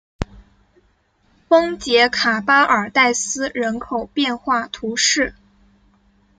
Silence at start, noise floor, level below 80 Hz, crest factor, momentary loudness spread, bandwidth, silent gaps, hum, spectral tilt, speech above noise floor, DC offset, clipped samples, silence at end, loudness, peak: 0.2 s; -61 dBFS; -44 dBFS; 18 dB; 10 LU; 10 kHz; none; none; -2 dB/octave; 43 dB; under 0.1%; under 0.1%; 1.05 s; -17 LUFS; -2 dBFS